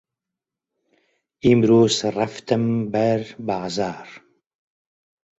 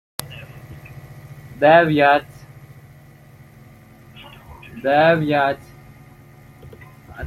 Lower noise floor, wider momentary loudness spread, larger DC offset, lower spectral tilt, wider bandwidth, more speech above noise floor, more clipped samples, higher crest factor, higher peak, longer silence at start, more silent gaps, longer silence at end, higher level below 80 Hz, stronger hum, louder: first, -86 dBFS vs -45 dBFS; second, 12 LU vs 27 LU; neither; about the same, -6 dB/octave vs -6 dB/octave; second, 8 kHz vs 16 kHz; first, 66 dB vs 30 dB; neither; about the same, 20 dB vs 22 dB; second, -4 dBFS vs 0 dBFS; first, 1.45 s vs 0.2 s; neither; first, 1.2 s vs 0 s; about the same, -54 dBFS vs -52 dBFS; neither; second, -20 LUFS vs -16 LUFS